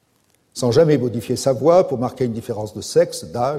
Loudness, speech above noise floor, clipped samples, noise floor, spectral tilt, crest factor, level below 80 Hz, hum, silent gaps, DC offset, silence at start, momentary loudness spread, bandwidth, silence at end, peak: -19 LUFS; 44 dB; under 0.1%; -62 dBFS; -6 dB/octave; 16 dB; -54 dBFS; none; none; under 0.1%; 0.55 s; 12 LU; 15.5 kHz; 0 s; -2 dBFS